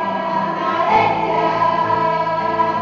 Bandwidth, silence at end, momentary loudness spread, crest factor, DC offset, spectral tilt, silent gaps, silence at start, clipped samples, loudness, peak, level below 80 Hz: 7.2 kHz; 0 s; 5 LU; 16 dB; under 0.1%; -6.5 dB/octave; none; 0 s; under 0.1%; -17 LUFS; -2 dBFS; -52 dBFS